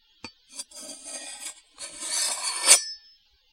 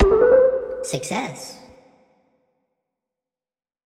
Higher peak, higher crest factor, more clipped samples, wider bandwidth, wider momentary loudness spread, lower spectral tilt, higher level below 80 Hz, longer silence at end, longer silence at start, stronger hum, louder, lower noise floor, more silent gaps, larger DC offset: first, 0 dBFS vs -4 dBFS; first, 28 dB vs 18 dB; neither; first, 16 kHz vs 13.5 kHz; first, 23 LU vs 20 LU; second, 3 dB/octave vs -5 dB/octave; second, -72 dBFS vs -36 dBFS; second, 0.55 s vs 2.3 s; first, 0.25 s vs 0 s; neither; about the same, -21 LUFS vs -19 LUFS; second, -59 dBFS vs under -90 dBFS; neither; neither